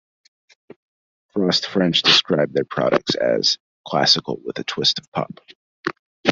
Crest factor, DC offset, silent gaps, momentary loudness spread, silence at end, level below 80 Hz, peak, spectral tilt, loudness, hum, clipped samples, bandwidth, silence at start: 20 dB; under 0.1%; 3.60-3.84 s, 5.08-5.12 s, 5.55-5.84 s, 5.99-6.23 s; 15 LU; 0 s; -62 dBFS; -2 dBFS; -3.5 dB/octave; -19 LUFS; none; under 0.1%; 7.8 kHz; 1.35 s